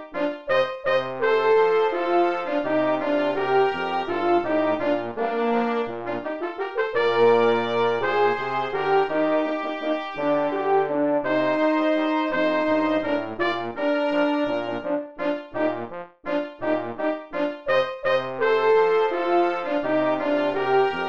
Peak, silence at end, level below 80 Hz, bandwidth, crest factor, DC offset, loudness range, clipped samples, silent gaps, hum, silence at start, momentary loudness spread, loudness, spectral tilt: -8 dBFS; 0 s; -60 dBFS; 7.2 kHz; 14 dB; 0.6%; 4 LU; under 0.1%; none; none; 0 s; 8 LU; -23 LUFS; -6.5 dB/octave